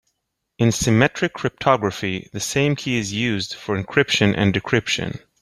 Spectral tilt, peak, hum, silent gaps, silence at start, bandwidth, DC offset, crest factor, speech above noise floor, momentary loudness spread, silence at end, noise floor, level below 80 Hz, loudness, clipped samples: -4.5 dB/octave; -2 dBFS; none; none; 0.6 s; 15 kHz; under 0.1%; 18 dB; 56 dB; 9 LU; 0.25 s; -76 dBFS; -48 dBFS; -20 LUFS; under 0.1%